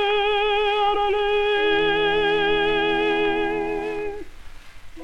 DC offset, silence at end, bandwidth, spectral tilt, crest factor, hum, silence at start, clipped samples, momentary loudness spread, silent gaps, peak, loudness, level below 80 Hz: under 0.1%; 0 s; 8.4 kHz; -4.5 dB/octave; 12 dB; none; 0 s; under 0.1%; 8 LU; none; -10 dBFS; -21 LUFS; -42 dBFS